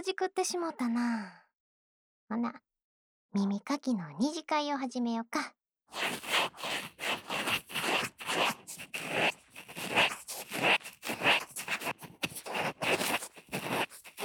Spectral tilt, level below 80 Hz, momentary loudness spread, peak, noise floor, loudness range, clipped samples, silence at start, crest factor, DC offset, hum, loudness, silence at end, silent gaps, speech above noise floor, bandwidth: -3 dB/octave; -76 dBFS; 11 LU; -14 dBFS; under -90 dBFS; 6 LU; under 0.1%; 0 s; 20 dB; under 0.1%; none; -32 LUFS; 0 s; 1.55-2.27 s, 2.82-3.29 s; over 57 dB; over 20 kHz